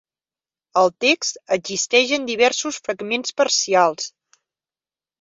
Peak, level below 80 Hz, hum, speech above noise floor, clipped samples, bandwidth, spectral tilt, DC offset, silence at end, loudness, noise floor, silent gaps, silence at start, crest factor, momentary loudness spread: -2 dBFS; -68 dBFS; none; over 70 dB; under 0.1%; 7.8 kHz; -1.5 dB/octave; under 0.1%; 1.15 s; -19 LUFS; under -90 dBFS; none; 0.75 s; 20 dB; 8 LU